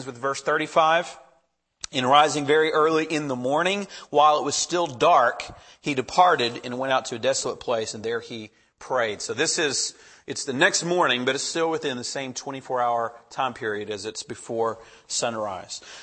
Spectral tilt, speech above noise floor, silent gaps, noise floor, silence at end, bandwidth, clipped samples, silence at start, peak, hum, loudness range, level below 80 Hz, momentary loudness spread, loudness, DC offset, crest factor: -2.5 dB/octave; 42 dB; none; -66 dBFS; 0 s; 8.8 kHz; under 0.1%; 0 s; -4 dBFS; none; 7 LU; -64 dBFS; 13 LU; -23 LUFS; under 0.1%; 20 dB